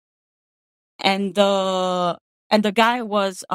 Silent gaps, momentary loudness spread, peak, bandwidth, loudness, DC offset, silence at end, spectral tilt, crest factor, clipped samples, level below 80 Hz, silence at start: 2.21-2.50 s; 5 LU; 0 dBFS; 15.5 kHz; -20 LUFS; under 0.1%; 0 s; -4.5 dB/octave; 22 dB; under 0.1%; -72 dBFS; 1 s